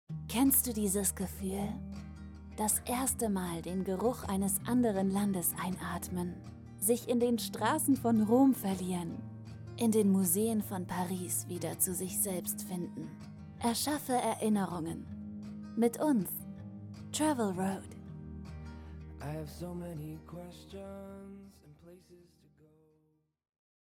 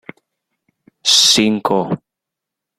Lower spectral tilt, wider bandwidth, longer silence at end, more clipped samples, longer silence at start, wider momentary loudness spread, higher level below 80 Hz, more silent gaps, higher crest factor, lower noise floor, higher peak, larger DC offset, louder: first, -5 dB/octave vs -2 dB/octave; first, 19 kHz vs 16 kHz; first, 1.65 s vs 0.8 s; neither; second, 0.1 s vs 1.05 s; first, 19 LU vs 14 LU; about the same, -56 dBFS vs -58 dBFS; neither; about the same, 20 dB vs 18 dB; second, -74 dBFS vs -83 dBFS; second, -14 dBFS vs 0 dBFS; neither; second, -32 LUFS vs -13 LUFS